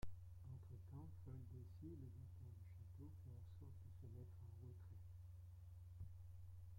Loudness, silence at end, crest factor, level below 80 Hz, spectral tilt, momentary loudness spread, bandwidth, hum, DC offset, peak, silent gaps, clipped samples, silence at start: -60 LUFS; 0 s; 20 dB; -68 dBFS; -8.5 dB/octave; 3 LU; 16.5 kHz; none; under 0.1%; -36 dBFS; none; under 0.1%; 0 s